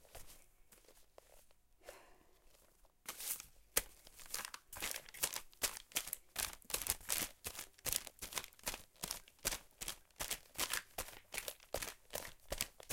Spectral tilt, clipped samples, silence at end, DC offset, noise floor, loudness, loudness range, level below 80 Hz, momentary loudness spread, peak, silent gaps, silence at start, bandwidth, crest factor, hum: 0 dB/octave; under 0.1%; 0 s; under 0.1%; -69 dBFS; -43 LUFS; 5 LU; -62 dBFS; 15 LU; -10 dBFS; none; 0 s; 17 kHz; 36 dB; none